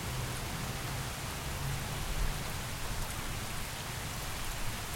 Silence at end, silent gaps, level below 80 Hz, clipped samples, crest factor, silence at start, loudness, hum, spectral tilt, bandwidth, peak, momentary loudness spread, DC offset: 0 s; none; -42 dBFS; under 0.1%; 18 dB; 0 s; -38 LUFS; none; -3.5 dB/octave; 16.5 kHz; -20 dBFS; 2 LU; under 0.1%